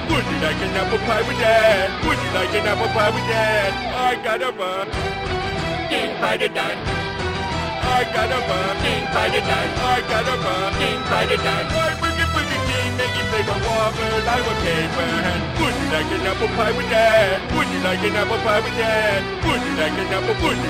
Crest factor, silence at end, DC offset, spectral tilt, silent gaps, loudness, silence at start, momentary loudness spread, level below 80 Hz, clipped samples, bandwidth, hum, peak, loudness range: 16 dB; 0 s; under 0.1%; -4.5 dB/octave; none; -20 LUFS; 0 s; 5 LU; -36 dBFS; under 0.1%; 16 kHz; none; -4 dBFS; 3 LU